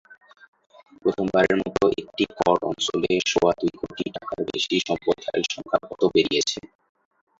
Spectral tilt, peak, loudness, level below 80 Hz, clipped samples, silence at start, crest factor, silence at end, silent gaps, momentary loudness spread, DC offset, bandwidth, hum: -4 dB/octave; -4 dBFS; -23 LUFS; -56 dBFS; under 0.1%; 1.05 s; 20 dB; 0.75 s; none; 9 LU; under 0.1%; 7.8 kHz; none